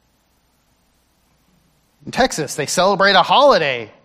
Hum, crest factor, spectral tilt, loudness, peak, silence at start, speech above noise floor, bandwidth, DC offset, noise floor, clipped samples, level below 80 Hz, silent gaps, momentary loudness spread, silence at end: none; 18 dB; -3 dB/octave; -15 LUFS; 0 dBFS; 2.05 s; 46 dB; 15.5 kHz; under 0.1%; -61 dBFS; under 0.1%; -50 dBFS; none; 10 LU; 0.15 s